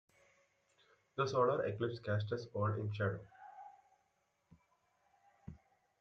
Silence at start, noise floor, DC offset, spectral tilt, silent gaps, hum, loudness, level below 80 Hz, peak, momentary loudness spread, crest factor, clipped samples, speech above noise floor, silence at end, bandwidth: 1.15 s; -80 dBFS; under 0.1%; -7 dB/octave; none; none; -38 LUFS; -74 dBFS; -20 dBFS; 23 LU; 20 dB; under 0.1%; 43 dB; 0.45 s; 6.8 kHz